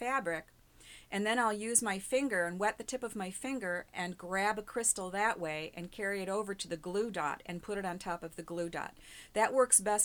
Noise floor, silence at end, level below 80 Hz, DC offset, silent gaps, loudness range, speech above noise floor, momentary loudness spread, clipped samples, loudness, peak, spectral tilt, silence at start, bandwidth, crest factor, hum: -57 dBFS; 0 s; -64 dBFS; under 0.1%; none; 4 LU; 22 dB; 11 LU; under 0.1%; -34 LUFS; -10 dBFS; -2.5 dB/octave; 0 s; 20 kHz; 26 dB; none